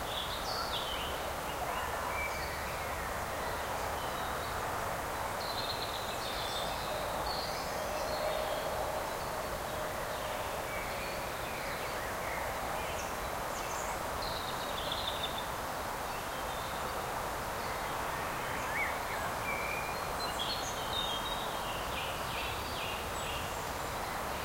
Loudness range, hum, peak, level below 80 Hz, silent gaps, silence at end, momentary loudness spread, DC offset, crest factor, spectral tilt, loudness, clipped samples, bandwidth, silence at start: 2 LU; none; -22 dBFS; -50 dBFS; none; 0 s; 3 LU; under 0.1%; 14 dB; -3 dB/octave; -36 LUFS; under 0.1%; 16 kHz; 0 s